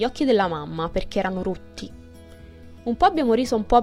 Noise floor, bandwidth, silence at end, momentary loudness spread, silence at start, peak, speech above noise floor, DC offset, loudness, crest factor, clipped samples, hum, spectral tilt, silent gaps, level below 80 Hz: -44 dBFS; 15 kHz; 0 s; 16 LU; 0 s; -4 dBFS; 22 dB; under 0.1%; -23 LUFS; 18 dB; under 0.1%; none; -6 dB/octave; none; -40 dBFS